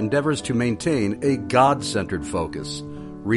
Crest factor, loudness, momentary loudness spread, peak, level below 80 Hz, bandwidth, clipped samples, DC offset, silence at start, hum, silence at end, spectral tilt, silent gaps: 18 dB; -23 LUFS; 14 LU; -4 dBFS; -48 dBFS; 11.5 kHz; under 0.1%; under 0.1%; 0 s; none; 0 s; -5.5 dB/octave; none